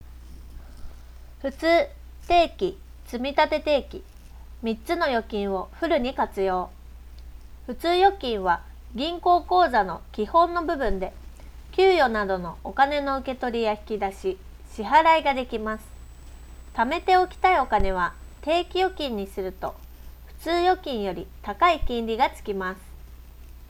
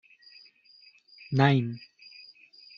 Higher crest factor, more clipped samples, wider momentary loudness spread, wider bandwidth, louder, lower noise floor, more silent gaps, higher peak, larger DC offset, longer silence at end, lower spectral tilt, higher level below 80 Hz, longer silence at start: second, 18 dB vs 24 dB; neither; second, 15 LU vs 27 LU; first, 17 kHz vs 6.8 kHz; about the same, -24 LUFS vs -26 LUFS; second, -44 dBFS vs -58 dBFS; neither; about the same, -6 dBFS vs -8 dBFS; neither; second, 0.05 s vs 1 s; about the same, -5.5 dB/octave vs -5.5 dB/octave; first, -40 dBFS vs -66 dBFS; second, 0.05 s vs 1.3 s